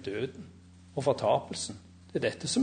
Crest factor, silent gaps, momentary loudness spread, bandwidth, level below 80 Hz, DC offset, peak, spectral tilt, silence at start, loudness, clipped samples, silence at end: 18 dB; none; 20 LU; 9.6 kHz; -60 dBFS; under 0.1%; -14 dBFS; -4.5 dB/octave; 0 s; -32 LUFS; under 0.1%; 0 s